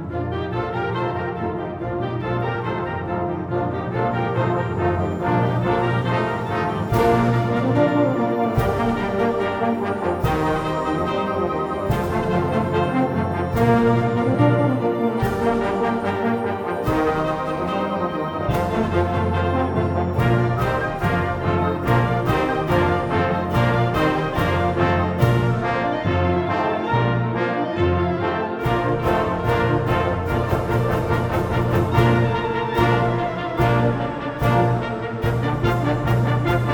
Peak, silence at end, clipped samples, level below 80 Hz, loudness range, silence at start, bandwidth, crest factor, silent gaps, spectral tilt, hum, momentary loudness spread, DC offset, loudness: -2 dBFS; 0 s; under 0.1%; -38 dBFS; 3 LU; 0 s; 18.5 kHz; 18 dB; none; -8 dB/octave; none; 6 LU; under 0.1%; -21 LUFS